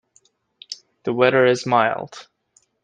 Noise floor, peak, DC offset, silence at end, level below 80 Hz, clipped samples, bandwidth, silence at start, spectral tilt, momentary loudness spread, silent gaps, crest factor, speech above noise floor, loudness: -62 dBFS; -2 dBFS; under 0.1%; 0.6 s; -66 dBFS; under 0.1%; 9.4 kHz; 0.7 s; -5 dB/octave; 20 LU; none; 20 dB; 44 dB; -19 LUFS